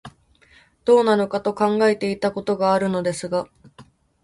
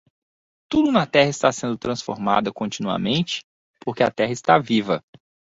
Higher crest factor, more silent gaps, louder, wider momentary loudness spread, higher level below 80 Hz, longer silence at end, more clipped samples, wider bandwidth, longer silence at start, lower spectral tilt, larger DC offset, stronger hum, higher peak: about the same, 18 dB vs 20 dB; second, none vs 3.44-3.74 s; about the same, -20 LUFS vs -21 LUFS; about the same, 10 LU vs 10 LU; about the same, -58 dBFS vs -56 dBFS; second, 0.4 s vs 0.6 s; neither; first, 11.5 kHz vs 8 kHz; second, 0.05 s vs 0.7 s; about the same, -5.5 dB/octave vs -5 dB/octave; neither; neither; about the same, -4 dBFS vs -2 dBFS